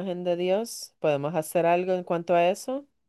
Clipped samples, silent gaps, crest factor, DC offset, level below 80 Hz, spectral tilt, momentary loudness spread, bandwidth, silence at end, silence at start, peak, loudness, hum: under 0.1%; none; 14 dB; under 0.1%; -76 dBFS; -5.5 dB/octave; 7 LU; 12.5 kHz; 0.25 s; 0 s; -12 dBFS; -26 LUFS; none